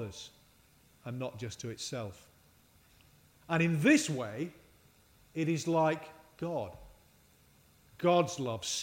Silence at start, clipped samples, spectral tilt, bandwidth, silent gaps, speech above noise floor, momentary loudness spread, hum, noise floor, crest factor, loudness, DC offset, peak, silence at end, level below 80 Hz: 0 s; under 0.1%; -5 dB/octave; 16 kHz; none; 32 dB; 18 LU; none; -64 dBFS; 22 dB; -33 LUFS; under 0.1%; -14 dBFS; 0 s; -68 dBFS